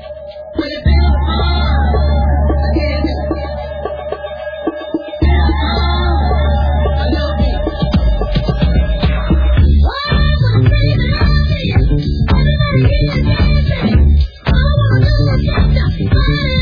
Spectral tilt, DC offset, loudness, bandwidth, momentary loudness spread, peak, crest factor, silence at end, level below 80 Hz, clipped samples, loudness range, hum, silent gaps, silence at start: -9 dB/octave; under 0.1%; -14 LUFS; 5.2 kHz; 10 LU; 0 dBFS; 12 dB; 0 s; -14 dBFS; under 0.1%; 4 LU; none; none; 0 s